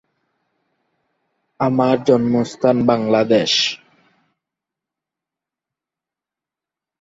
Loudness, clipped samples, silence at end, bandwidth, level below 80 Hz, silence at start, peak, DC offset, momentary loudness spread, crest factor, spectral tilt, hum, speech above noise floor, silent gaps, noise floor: -16 LUFS; under 0.1%; 3.25 s; 7.8 kHz; -60 dBFS; 1.6 s; -2 dBFS; under 0.1%; 6 LU; 20 dB; -5 dB/octave; none; 72 dB; none; -87 dBFS